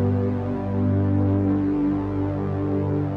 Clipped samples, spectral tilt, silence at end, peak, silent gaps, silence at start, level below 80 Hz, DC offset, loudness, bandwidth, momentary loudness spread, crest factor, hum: under 0.1%; -11.5 dB/octave; 0 s; -10 dBFS; none; 0 s; -44 dBFS; under 0.1%; -23 LUFS; 4.1 kHz; 4 LU; 10 dB; 50 Hz at -40 dBFS